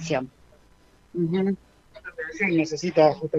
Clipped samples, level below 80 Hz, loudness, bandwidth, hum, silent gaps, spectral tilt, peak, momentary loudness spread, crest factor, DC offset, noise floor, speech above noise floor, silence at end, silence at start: under 0.1%; -60 dBFS; -25 LUFS; 8 kHz; none; none; -6 dB/octave; -6 dBFS; 19 LU; 20 dB; under 0.1%; -57 dBFS; 33 dB; 0 s; 0 s